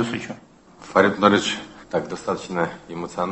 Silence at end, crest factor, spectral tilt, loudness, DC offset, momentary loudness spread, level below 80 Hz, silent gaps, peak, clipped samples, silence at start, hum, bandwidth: 0 s; 22 dB; -4.5 dB/octave; -22 LUFS; under 0.1%; 15 LU; -56 dBFS; none; 0 dBFS; under 0.1%; 0 s; none; 8.6 kHz